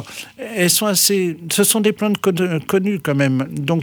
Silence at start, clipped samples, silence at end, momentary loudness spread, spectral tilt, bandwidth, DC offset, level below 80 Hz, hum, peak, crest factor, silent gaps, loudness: 0 s; under 0.1%; 0 s; 7 LU; -4 dB/octave; over 20 kHz; under 0.1%; -60 dBFS; none; -2 dBFS; 16 dB; none; -17 LUFS